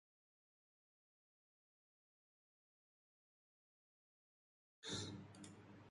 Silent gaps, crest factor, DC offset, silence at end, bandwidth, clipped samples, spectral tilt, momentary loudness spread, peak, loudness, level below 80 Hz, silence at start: none; 24 dB; under 0.1%; 0 s; 11 kHz; under 0.1%; -3.5 dB/octave; 12 LU; -36 dBFS; -51 LUFS; -82 dBFS; 4.8 s